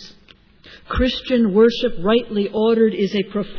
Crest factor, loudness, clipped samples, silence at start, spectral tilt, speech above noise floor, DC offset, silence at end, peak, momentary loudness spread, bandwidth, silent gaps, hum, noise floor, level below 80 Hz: 14 dB; -18 LUFS; under 0.1%; 0 s; -7 dB/octave; 32 dB; under 0.1%; 0 s; -4 dBFS; 7 LU; 5.4 kHz; none; none; -50 dBFS; -36 dBFS